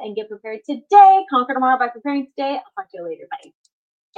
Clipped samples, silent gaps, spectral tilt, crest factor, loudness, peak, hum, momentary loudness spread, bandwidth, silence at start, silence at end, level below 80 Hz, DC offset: under 0.1%; none; -4.5 dB/octave; 18 dB; -16 LUFS; 0 dBFS; none; 22 LU; 6.8 kHz; 0 s; 0.8 s; -78 dBFS; under 0.1%